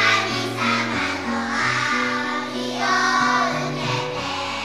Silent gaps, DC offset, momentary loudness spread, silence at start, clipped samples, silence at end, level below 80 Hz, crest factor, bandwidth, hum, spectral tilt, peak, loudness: none; 0.3%; 7 LU; 0 s; under 0.1%; 0 s; -58 dBFS; 18 dB; 15 kHz; none; -3.5 dB/octave; -4 dBFS; -21 LUFS